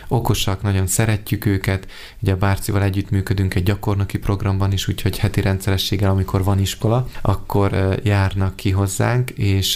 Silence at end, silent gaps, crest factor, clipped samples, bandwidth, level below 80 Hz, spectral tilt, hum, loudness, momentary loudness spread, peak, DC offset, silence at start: 0 s; none; 16 dB; under 0.1%; 16 kHz; -34 dBFS; -5.5 dB/octave; none; -20 LUFS; 3 LU; -2 dBFS; under 0.1%; 0 s